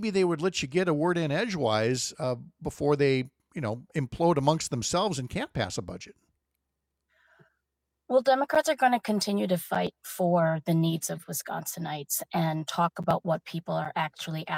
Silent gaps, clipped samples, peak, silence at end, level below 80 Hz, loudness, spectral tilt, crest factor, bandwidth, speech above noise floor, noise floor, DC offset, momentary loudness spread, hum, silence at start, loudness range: none; under 0.1%; -10 dBFS; 0 s; -60 dBFS; -28 LUFS; -5 dB/octave; 20 dB; 16.5 kHz; 56 dB; -83 dBFS; under 0.1%; 10 LU; none; 0 s; 5 LU